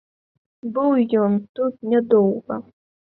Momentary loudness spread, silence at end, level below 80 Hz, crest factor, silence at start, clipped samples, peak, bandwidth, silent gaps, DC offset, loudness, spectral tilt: 13 LU; 0.55 s; -66 dBFS; 16 dB; 0.65 s; under 0.1%; -4 dBFS; 4.2 kHz; 1.49-1.55 s; under 0.1%; -20 LUFS; -12 dB/octave